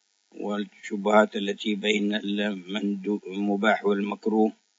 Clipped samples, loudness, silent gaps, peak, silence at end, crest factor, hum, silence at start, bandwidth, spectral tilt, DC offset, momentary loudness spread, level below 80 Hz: under 0.1%; -26 LUFS; none; -6 dBFS; 0.3 s; 20 dB; none; 0.35 s; 7.8 kHz; -5.5 dB/octave; under 0.1%; 10 LU; -80 dBFS